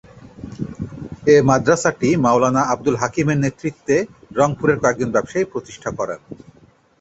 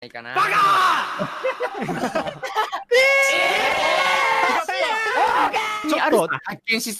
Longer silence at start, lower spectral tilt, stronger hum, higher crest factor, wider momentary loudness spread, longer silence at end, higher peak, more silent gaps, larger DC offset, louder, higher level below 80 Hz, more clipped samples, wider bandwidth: first, 0.25 s vs 0 s; first, -6 dB/octave vs -2.5 dB/octave; neither; about the same, 18 dB vs 14 dB; first, 16 LU vs 10 LU; first, 0.65 s vs 0 s; first, -2 dBFS vs -6 dBFS; neither; neither; about the same, -18 LUFS vs -19 LUFS; first, -48 dBFS vs -60 dBFS; neither; second, 8.2 kHz vs 14 kHz